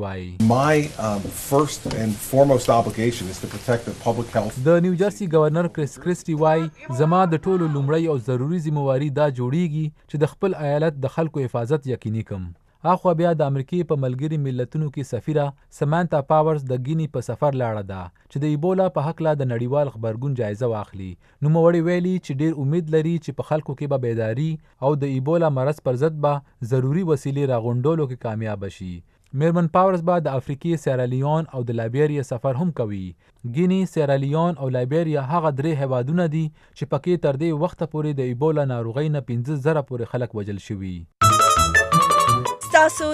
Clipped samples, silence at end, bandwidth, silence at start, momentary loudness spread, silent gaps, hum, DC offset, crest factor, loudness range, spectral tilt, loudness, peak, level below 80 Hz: under 0.1%; 0 s; 15 kHz; 0 s; 10 LU; none; none; under 0.1%; 20 dB; 3 LU; -6.5 dB/octave; -22 LUFS; 0 dBFS; -48 dBFS